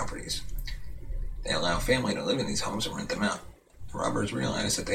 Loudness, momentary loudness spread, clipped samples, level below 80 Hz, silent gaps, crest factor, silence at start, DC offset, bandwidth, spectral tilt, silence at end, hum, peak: -30 LUFS; 14 LU; under 0.1%; -40 dBFS; none; 18 dB; 0 s; under 0.1%; 16 kHz; -3.5 dB/octave; 0 s; none; -12 dBFS